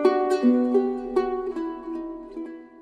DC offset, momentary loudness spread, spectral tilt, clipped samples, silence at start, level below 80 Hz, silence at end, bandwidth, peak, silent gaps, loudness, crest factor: under 0.1%; 16 LU; -5.5 dB/octave; under 0.1%; 0 s; -56 dBFS; 0 s; 9.8 kHz; -6 dBFS; none; -24 LUFS; 18 dB